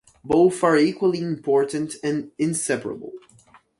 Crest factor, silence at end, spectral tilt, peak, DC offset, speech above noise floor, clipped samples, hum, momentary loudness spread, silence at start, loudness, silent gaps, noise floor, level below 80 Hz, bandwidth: 18 dB; 0.6 s; -5 dB/octave; -6 dBFS; under 0.1%; 33 dB; under 0.1%; none; 9 LU; 0.25 s; -22 LUFS; none; -54 dBFS; -60 dBFS; 11.5 kHz